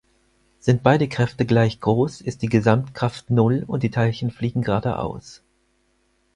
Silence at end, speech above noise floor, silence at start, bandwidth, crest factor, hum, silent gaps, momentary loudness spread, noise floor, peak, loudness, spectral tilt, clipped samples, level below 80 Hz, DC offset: 1 s; 45 dB; 0.65 s; 10.5 kHz; 20 dB; none; none; 8 LU; -65 dBFS; 0 dBFS; -21 LUFS; -7.5 dB/octave; under 0.1%; -50 dBFS; under 0.1%